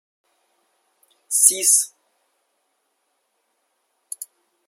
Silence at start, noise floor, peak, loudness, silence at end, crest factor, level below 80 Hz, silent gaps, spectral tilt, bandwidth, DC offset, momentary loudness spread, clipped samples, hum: 1.3 s; -71 dBFS; 0 dBFS; -15 LUFS; 0.45 s; 26 dB; under -90 dBFS; none; 2 dB/octave; 16.5 kHz; under 0.1%; 23 LU; under 0.1%; none